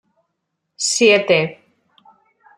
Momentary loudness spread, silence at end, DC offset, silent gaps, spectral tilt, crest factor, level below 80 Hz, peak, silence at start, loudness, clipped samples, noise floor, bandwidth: 10 LU; 1.05 s; under 0.1%; none; -2.5 dB/octave; 18 dB; -66 dBFS; -2 dBFS; 0.8 s; -15 LUFS; under 0.1%; -75 dBFS; 13.5 kHz